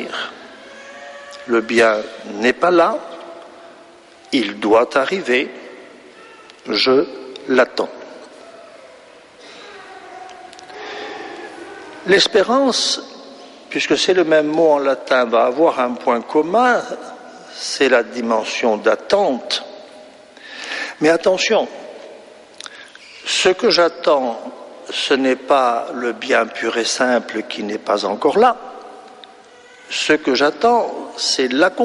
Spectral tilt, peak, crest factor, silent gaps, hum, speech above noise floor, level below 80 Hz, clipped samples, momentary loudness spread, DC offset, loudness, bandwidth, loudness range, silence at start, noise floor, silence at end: -3 dB/octave; -2 dBFS; 16 dB; none; none; 28 dB; -62 dBFS; under 0.1%; 22 LU; under 0.1%; -17 LUFS; 11.5 kHz; 5 LU; 0 s; -44 dBFS; 0 s